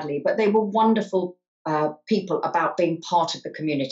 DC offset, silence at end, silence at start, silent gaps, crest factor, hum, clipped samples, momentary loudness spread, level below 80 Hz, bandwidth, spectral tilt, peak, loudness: under 0.1%; 0 s; 0 s; 1.48-1.65 s; 14 dB; none; under 0.1%; 7 LU; -76 dBFS; 7.8 kHz; -6 dB/octave; -8 dBFS; -23 LUFS